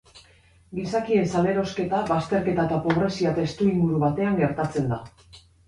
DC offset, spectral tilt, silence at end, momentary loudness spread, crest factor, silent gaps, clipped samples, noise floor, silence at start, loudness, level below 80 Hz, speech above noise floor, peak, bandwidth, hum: under 0.1%; -7.5 dB/octave; 0.3 s; 5 LU; 18 dB; none; under 0.1%; -56 dBFS; 0.15 s; -24 LUFS; -52 dBFS; 33 dB; -6 dBFS; 11 kHz; none